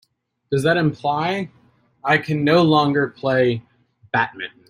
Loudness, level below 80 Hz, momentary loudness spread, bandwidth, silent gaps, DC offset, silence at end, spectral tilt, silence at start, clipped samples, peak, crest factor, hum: -19 LUFS; -58 dBFS; 10 LU; 15 kHz; none; under 0.1%; 0.2 s; -6.5 dB/octave; 0.5 s; under 0.1%; -2 dBFS; 18 dB; none